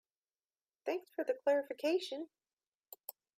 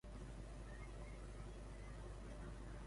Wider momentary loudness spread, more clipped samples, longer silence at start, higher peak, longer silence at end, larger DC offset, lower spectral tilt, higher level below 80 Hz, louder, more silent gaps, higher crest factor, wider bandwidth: first, 16 LU vs 1 LU; neither; first, 0.85 s vs 0.05 s; first, -22 dBFS vs -40 dBFS; first, 0.25 s vs 0 s; neither; second, -2 dB/octave vs -6 dB/octave; second, under -90 dBFS vs -54 dBFS; first, -37 LUFS vs -55 LUFS; first, 2.53-2.57 s, 2.68-2.80 s vs none; first, 18 dB vs 12 dB; first, 15.5 kHz vs 11.5 kHz